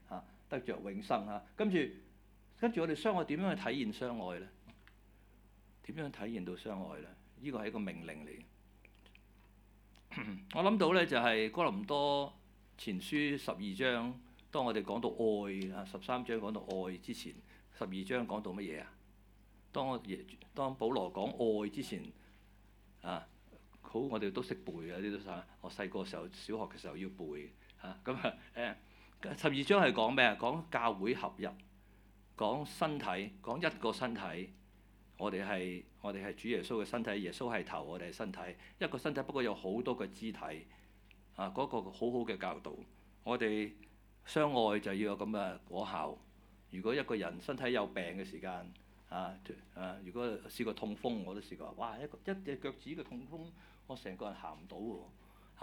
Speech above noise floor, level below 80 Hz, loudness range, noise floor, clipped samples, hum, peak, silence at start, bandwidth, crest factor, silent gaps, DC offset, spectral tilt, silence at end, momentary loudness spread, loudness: 25 dB; -64 dBFS; 11 LU; -63 dBFS; under 0.1%; none; -12 dBFS; 0.05 s; 19 kHz; 28 dB; none; under 0.1%; -5.5 dB/octave; 0 s; 15 LU; -39 LUFS